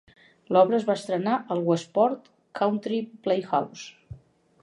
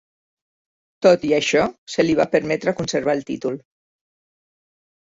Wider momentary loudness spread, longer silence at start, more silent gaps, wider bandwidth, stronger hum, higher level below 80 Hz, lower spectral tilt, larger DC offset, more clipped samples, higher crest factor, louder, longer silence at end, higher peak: first, 16 LU vs 10 LU; second, 0.5 s vs 1 s; second, none vs 1.78-1.87 s; first, 11.5 kHz vs 8 kHz; neither; second, -64 dBFS vs -58 dBFS; first, -6.5 dB/octave vs -4.5 dB/octave; neither; neither; about the same, 20 dB vs 20 dB; second, -25 LUFS vs -20 LUFS; second, 0.45 s vs 1.55 s; second, -6 dBFS vs -2 dBFS